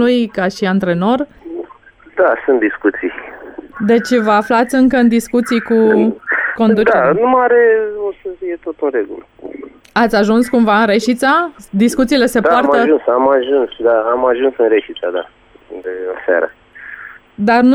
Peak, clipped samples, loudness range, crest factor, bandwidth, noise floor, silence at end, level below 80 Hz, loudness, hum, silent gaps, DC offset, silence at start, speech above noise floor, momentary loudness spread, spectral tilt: -2 dBFS; under 0.1%; 4 LU; 12 dB; 14 kHz; -42 dBFS; 0 s; -48 dBFS; -13 LUFS; none; none; under 0.1%; 0 s; 30 dB; 18 LU; -5.5 dB/octave